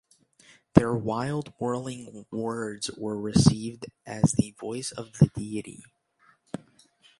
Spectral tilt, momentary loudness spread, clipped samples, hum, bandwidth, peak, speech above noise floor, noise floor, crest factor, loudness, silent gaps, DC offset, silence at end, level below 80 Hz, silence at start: -6 dB/octave; 19 LU; under 0.1%; none; 11.5 kHz; 0 dBFS; 37 dB; -64 dBFS; 28 dB; -27 LUFS; none; under 0.1%; 0.6 s; -50 dBFS; 0.75 s